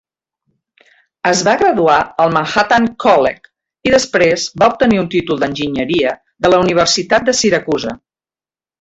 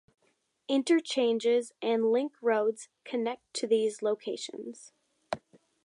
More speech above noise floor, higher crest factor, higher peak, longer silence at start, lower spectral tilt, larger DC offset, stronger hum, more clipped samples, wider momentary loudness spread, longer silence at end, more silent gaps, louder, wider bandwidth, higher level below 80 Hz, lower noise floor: first, over 77 dB vs 44 dB; about the same, 14 dB vs 16 dB; first, 0 dBFS vs -16 dBFS; first, 1.25 s vs 0.7 s; about the same, -4 dB/octave vs -3.5 dB/octave; neither; neither; neither; second, 8 LU vs 14 LU; first, 0.85 s vs 0.45 s; neither; first, -13 LUFS vs -30 LUFS; second, 8.2 kHz vs 11 kHz; first, -46 dBFS vs -78 dBFS; first, under -90 dBFS vs -74 dBFS